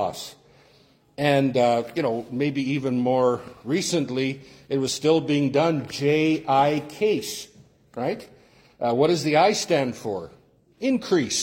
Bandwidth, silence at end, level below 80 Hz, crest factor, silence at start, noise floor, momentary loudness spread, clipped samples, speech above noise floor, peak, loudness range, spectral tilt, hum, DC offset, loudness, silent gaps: 16.5 kHz; 0 s; -64 dBFS; 18 dB; 0 s; -58 dBFS; 13 LU; under 0.1%; 35 dB; -6 dBFS; 2 LU; -5 dB/octave; none; under 0.1%; -23 LUFS; none